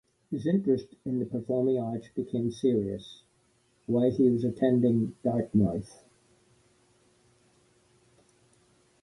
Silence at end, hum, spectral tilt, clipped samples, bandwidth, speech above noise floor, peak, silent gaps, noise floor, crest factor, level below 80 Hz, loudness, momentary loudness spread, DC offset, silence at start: 3.15 s; none; -9 dB/octave; under 0.1%; 11.5 kHz; 41 dB; -12 dBFS; none; -68 dBFS; 18 dB; -60 dBFS; -28 LUFS; 12 LU; under 0.1%; 0.3 s